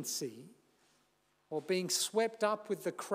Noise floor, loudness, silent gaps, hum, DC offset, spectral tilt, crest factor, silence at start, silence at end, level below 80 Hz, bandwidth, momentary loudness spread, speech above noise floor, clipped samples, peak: -75 dBFS; -35 LUFS; none; 50 Hz at -70 dBFS; under 0.1%; -2.5 dB/octave; 18 dB; 0 s; 0 s; under -90 dBFS; 16 kHz; 11 LU; 39 dB; under 0.1%; -18 dBFS